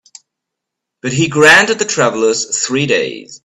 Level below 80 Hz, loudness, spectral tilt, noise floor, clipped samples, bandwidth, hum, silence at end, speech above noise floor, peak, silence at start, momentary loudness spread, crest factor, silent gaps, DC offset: -52 dBFS; -12 LUFS; -3 dB/octave; -79 dBFS; 0.1%; 13.5 kHz; none; 0.1 s; 66 dB; 0 dBFS; 1.05 s; 12 LU; 14 dB; none; under 0.1%